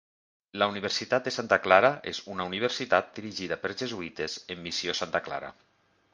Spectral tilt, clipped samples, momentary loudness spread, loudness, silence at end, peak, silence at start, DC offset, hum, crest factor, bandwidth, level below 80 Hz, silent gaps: -3.5 dB/octave; under 0.1%; 15 LU; -28 LUFS; 0.6 s; -4 dBFS; 0.55 s; under 0.1%; none; 26 dB; 9.8 kHz; -64 dBFS; none